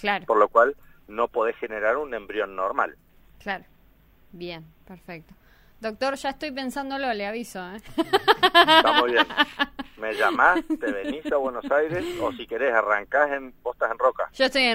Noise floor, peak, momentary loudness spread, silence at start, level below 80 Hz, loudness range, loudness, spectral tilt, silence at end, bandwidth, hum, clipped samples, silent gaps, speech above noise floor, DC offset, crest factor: -56 dBFS; -4 dBFS; 17 LU; 0 s; -54 dBFS; 14 LU; -23 LUFS; -3.5 dB/octave; 0 s; 16 kHz; none; under 0.1%; none; 33 dB; under 0.1%; 22 dB